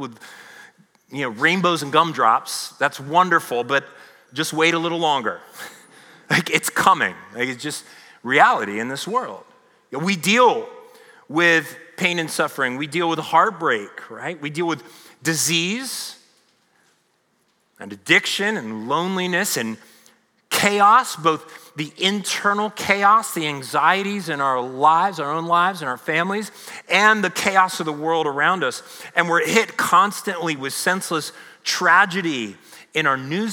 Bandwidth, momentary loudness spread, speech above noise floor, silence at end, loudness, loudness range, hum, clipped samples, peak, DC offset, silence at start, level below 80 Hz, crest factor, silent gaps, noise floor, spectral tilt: over 20 kHz; 15 LU; 45 dB; 0 s; -19 LUFS; 4 LU; none; under 0.1%; 0 dBFS; under 0.1%; 0 s; -74 dBFS; 20 dB; none; -65 dBFS; -3 dB/octave